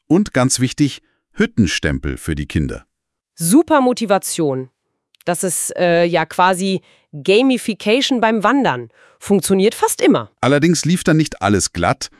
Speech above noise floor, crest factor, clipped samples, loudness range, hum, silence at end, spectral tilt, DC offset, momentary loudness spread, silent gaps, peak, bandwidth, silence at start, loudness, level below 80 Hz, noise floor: 47 dB; 16 dB; under 0.1%; 3 LU; none; 0.15 s; -4.5 dB/octave; under 0.1%; 10 LU; none; 0 dBFS; 12 kHz; 0.1 s; -16 LUFS; -40 dBFS; -63 dBFS